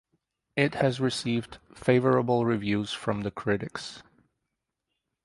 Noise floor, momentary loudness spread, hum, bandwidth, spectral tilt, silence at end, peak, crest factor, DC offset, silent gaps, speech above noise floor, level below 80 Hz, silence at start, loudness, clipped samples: -83 dBFS; 12 LU; none; 11.5 kHz; -6 dB/octave; 1.25 s; -8 dBFS; 22 dB; under 0.1%; none; 57 dB; -60 dBFS; 0.55 s; -27 LUFS; under 0.1%